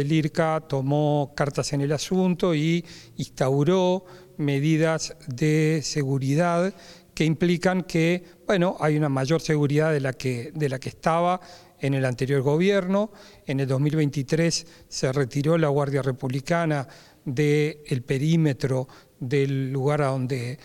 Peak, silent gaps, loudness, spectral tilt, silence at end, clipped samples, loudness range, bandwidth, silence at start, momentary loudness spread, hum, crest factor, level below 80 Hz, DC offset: -6 dBFS; none; -24 LUFS; -6.5 dB/octave; 0.1 s; under 0.1%; 1 LU; 13 kHz; 0 s; 8 LU; none; 18 dB; -56 dBFS; under 0.1%